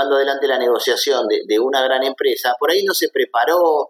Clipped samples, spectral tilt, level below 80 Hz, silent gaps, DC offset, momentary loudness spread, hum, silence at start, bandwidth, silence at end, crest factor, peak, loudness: under 0.1%; -1 dB/octave; -80 dBFS; none; under 0.1%; 2 LU; none; 0 s; 17.5 kHz; 0 s; 14 dB; -4 dBFS; -17 LUFS